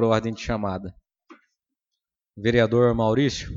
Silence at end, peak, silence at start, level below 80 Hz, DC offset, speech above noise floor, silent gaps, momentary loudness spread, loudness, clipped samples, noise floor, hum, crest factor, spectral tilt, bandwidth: 0 s; -4 dBFS; 0 s; -46 dBFS; under 0.1%; 63 dB; none; 11 LU; -22 LUFS; under 0.1%; -85 dBFS; none; 20 dB; -6.5 dB/octave; 7.8 kHz